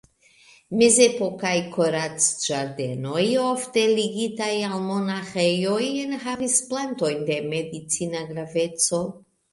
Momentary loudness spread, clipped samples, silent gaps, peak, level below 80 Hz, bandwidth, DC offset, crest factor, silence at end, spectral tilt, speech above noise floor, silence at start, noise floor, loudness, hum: 9 LU; under 0.1%; none; -2 dBFS; -66 dBFS; 11.5 kHz; under 0.1%; 22 dB; 0.35 s; -3.5 dB/octave; 32 dB; 0.7 s; -55 dBFS; -23 LUFS; none